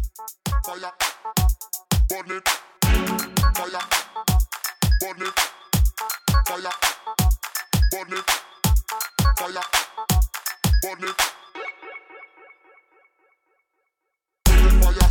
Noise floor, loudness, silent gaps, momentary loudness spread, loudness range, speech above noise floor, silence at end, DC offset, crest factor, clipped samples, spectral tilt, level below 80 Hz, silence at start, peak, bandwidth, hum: -80 dBFS; -23 LUFS; none; 7 LU; 5 LU; 56 dB; 0 s; under 0.1%; 18 dB; under 0.1%; -3.5 dB/octave; -24 dBFS; 0 s; -2 dBFS; 18 kHz; none